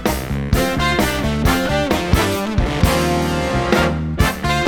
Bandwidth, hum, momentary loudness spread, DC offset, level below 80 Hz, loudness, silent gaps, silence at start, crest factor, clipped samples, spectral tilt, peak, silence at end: over 20 kHz; none; 3 LU; under 0.1%; -26 dBFS; -18 LUFS; none; 0 s; 16 dB; under 0.1%; -5 dB/octave; 0 dBFS; 0 s